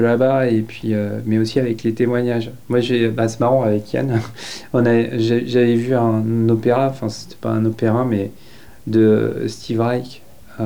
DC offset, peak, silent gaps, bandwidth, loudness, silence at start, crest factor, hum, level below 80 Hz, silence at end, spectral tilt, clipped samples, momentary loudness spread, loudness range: 1%; -4 dBFS; none; 20 kHz; -18 LUFS; 0 s; 14 dB; none; -54 dBFS; 0 s; -7.5 dB/octave; under 0.1%; 9 LU; 2 LU